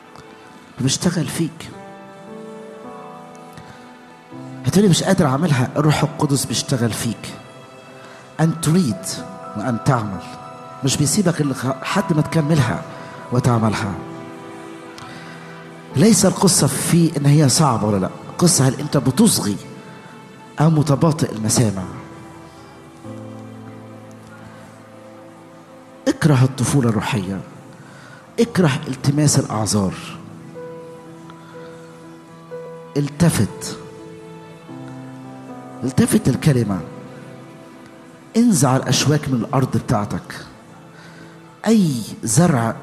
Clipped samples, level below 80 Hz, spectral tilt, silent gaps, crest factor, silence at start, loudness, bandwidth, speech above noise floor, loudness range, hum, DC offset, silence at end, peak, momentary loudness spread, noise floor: under 0.1%; -52 dBFS; -5 dB/octave; none; 18 dB; 0.2 s; -18 LUFS; 13.5 kHz; 25 dB; 9 LU; none; under 0.1%; 0 s; -2 dBFS; 24 LU; -42 dBFS